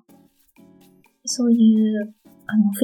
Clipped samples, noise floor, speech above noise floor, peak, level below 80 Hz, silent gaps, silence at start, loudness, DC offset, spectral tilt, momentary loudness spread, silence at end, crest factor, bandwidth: under 0.1%; -55 dBFS; 37 dB; -6 dBFS; -76 dBFS; none; 1.25 s; -19 LUFS; under 0.1%; -5.5 dB/octave; 18 LU; 0 s; 16 dB; 14.5 kHz